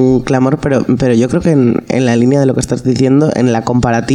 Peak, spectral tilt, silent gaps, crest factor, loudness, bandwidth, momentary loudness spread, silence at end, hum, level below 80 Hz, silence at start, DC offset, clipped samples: 0 dBFS; -7 dB/octave; none; 10 dB; -12 LUFS; 11.5 kHz; 3 LU; 0 s; none; -36 dBFS; 0 s; under 0.1%; under 0.1%